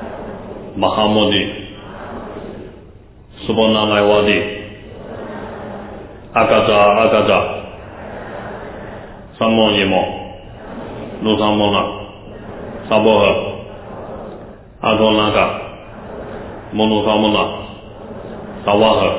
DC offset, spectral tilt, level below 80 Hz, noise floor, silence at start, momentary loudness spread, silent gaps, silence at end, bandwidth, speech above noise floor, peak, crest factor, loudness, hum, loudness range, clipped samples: under 0.1%; -9.5 dB/octave; -40 dBFS; -41 dBFS; 0 s; 20 LU; none; 0 s; 4 kHz; 27 dB; 0 dBFS; 18 dB; -14 LUFS; none; 3 LU; under 0.1%